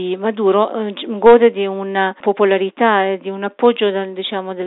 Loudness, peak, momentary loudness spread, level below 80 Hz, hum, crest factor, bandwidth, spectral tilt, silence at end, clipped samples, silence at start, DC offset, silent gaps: -16 LUFS; 0 dBFS; 12 LU; -58 dBFS; none; 16 dB; 4.1 kHz; -3 dB/octave; 0 s; under 0.1%; 0 s; under 0.1%; none